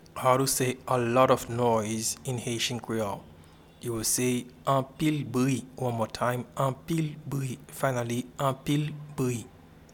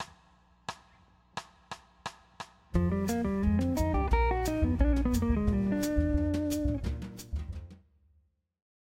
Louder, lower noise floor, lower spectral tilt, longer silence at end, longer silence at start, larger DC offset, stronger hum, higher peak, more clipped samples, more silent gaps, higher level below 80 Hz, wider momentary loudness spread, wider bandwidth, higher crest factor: about the same, -28 LUFS vs -30 LUFS; second, -53 dBFS vs -70 dBFS; second, -4.5 dB/octave vs -7 dB/octave; second, 0.1 s vs 1.1 s; first, 0.15 s vs 0 s; neither; neither; first, -8 dBFS vs -14 dBFS; neither; neither; second, -58 dBFS vs -36 dBFS; second, 10 LU vs 17 LU; first, 18.5 kHz vs 16 kHz; about the same, 20 dB vs 18 dB